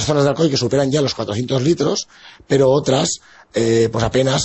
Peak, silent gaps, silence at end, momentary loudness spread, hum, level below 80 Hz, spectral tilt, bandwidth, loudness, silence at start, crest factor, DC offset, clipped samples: -4 dBFS; none; 0 s; 8 LU; none; -44 dBFS; -5 dB/octave; 8.4 kHz; -17 LUFS; 0 s; 14 dB; under 0.1%; under 0.1%